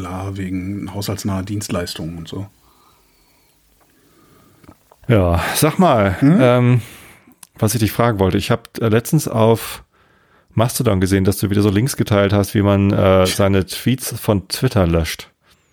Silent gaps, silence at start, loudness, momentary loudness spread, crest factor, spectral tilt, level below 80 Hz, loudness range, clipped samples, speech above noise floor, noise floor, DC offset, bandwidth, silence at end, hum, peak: none; 0 s; -17 LUFS; 13 LU; 16 dB; -6 dB/octave; -40 dBFS; 11 LU; under 0.1%; 40 dB; -56 dBFS; under 0.1%; over 20 kHz; 0.5 s; none; -2 dBFS